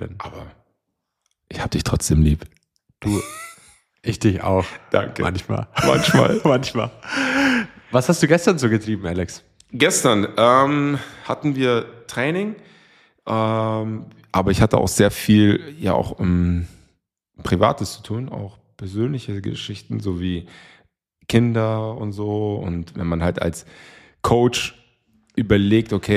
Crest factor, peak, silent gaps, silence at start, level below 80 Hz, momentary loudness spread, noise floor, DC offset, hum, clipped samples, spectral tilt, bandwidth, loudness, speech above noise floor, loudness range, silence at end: 18 dB; -2 dBFS; none; 0 s; -38 dBFS; 15 LU; -77 dBFS; under 0.1%; none; under 0.1%; -5.5 dB/octave; 15.5 kHz; -20 LUFS; 58 dB; 6 LU; 0 s